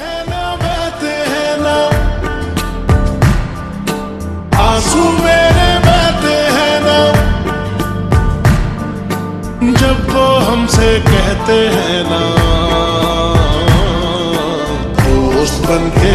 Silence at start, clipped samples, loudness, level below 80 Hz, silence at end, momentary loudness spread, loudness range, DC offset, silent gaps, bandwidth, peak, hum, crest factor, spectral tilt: 0 s; under 0.1%; -12 LUFS; -20 dBFS; 0 s; 9 LU; 4 LU; under 0.1%; none; 14.5 kHz; 0 dBFS; none; 12 dB; -5.5 dB/octave